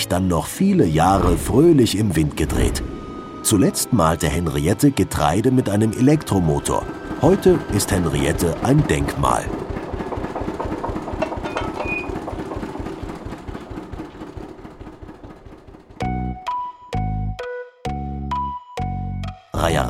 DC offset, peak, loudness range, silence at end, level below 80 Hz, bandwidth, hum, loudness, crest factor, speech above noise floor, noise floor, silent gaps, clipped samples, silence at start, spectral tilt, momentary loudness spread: under 0.1%; -2 dBFS; 13 LU; 0 s; -34 dBFS; 16 kHz; none; -20 LUFS; 18 dB; 25 dB; -42 dBFS; none; under 0.1%; 0 s; -5.5 dB/octave; 17 LU